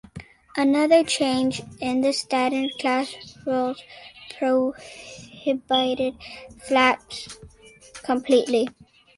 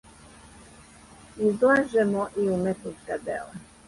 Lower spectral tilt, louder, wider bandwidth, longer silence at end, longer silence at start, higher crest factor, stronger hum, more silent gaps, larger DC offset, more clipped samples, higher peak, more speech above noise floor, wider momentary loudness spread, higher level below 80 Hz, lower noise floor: second, -3.5 dB/octave vs -6.5 dB/octave; about the same, -23 LUFS vs -25 LUFS; about the same, 11.5 kHz vs 11.5 kHz; first, 0.45 s vs 0.25 s; second, 0.15 s vs 1.35 s; about the same, 20 dB vs 16 dB; neither; neither; neither; neither; first, -4 dBFS vs -10 dBFS; about the same, 25 dB vs 25 dB; first, 21 LU vs 14 LU; about the same, -58 dBFS vs -58 dBFS; about the same, -48 dBFS vs -50 dBFS